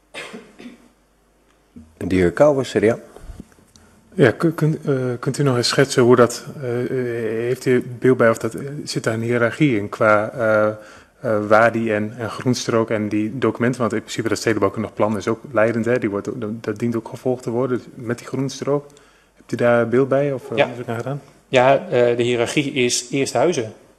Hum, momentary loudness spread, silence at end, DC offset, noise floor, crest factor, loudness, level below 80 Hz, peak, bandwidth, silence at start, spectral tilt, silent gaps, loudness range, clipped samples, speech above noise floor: none; 11 LU; 0.25 s; under 0.1%; -58 dBFS; 20 dB; -19 LUFS; -54 dBFS; 0 dBFS; 13.5 kHz; 0.15 s; -5.5 dB/octave; none; 4 LU; under 0.1%; 39 dB